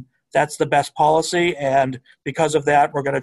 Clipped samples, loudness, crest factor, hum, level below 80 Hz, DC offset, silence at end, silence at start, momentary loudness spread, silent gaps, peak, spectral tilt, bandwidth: under 0.1%; -19 LUFS; 16 dB; none; -56 dBFS; under 0.1%; 0 s; 0 s; 7 LU; none; -4 dBFS; -4.5 dB/octave; 12.5 kHz